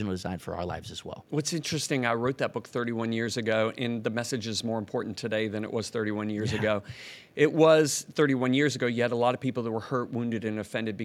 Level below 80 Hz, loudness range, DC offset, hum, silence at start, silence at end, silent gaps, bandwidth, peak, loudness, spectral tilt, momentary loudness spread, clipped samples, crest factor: -66 dBFS; 5 LU; under 0.1%; none; 0 s; 0 s; none; 15.5 kHz; -8 dBFS; -28 LUFS; -5 dB/octave; 10 LU; under 0.1%; 20 dB